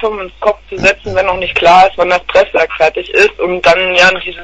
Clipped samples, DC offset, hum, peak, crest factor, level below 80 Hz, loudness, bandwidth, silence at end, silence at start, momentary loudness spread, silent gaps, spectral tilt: 0.5%; under 0.1%; none; 0 dBFS; 10 dB; -36 dBFS; -10 LUFS; 11 kHz; 0 s; 0 s; 9 LU; none; -3.5 dB/octave